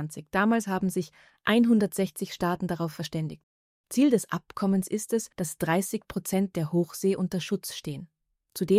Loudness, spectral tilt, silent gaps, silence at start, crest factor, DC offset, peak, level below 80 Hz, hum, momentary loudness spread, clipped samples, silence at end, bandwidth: -28 LUFS; -5.5 dB/octave; 3.43-3.84 s; 0 s; 18 dB; under 0.1%; -10 dBFS; -62 dBFS; none; 11 LU; under 0.1%; 0 s; 16 kHz